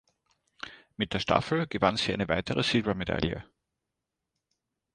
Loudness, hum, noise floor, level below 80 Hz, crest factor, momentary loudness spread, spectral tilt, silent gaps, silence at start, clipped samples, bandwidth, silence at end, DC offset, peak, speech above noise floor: -28 LUFS; none; -86 dBFS; -52 dBFS; 24 dB; 17 LU; -5.5 dB/octave; none; 0.65 s; under 0.1%; 11 kHz; 1.5 s; under 0.1%; -8 dBFS; 57 dB